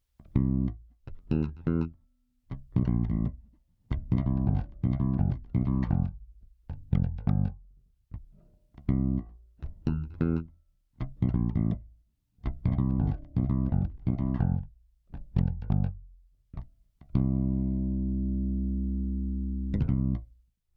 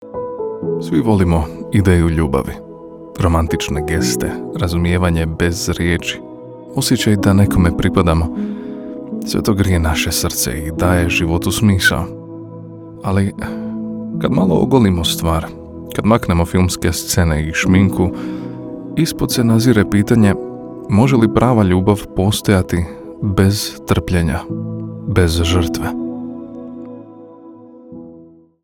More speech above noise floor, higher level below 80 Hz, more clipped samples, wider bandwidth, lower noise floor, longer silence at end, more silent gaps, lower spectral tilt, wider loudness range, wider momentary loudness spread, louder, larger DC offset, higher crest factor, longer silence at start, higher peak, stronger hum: first, 40 dB vs 28 dB; about the same, -36 dBFS vs -34 dBFS; neither; second, 4.6 kHz vs 18.5 kHz; first, -68 dBFS vs -43 dBFS; about the same, 0.5 s vs 0.4 s; neither; first, -12 dB/octave vs -5.5 dB/octave; about the same, 3 LU vs 4 LU; about the same, 18 LU vs 16 LU; second, -30 LUFS vs -16 LUFS; neither; about the same, 18 dB vs 16 dB; first, 0.2 s vs 0 s; second, -12 dBFS vs 0 dBFS; neither